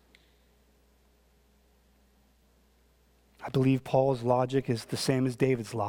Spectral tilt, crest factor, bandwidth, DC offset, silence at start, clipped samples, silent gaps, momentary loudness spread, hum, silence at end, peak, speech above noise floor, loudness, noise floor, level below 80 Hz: -6.5 dB/octave; 20 dB; 17 kHz; under 0.1%; 3.4 s; under 0.1%; none; 6 LU; none; 0 s; -12 dBFS; 37 dB; -28 LUFS; -65 dBFS; -62 dBFS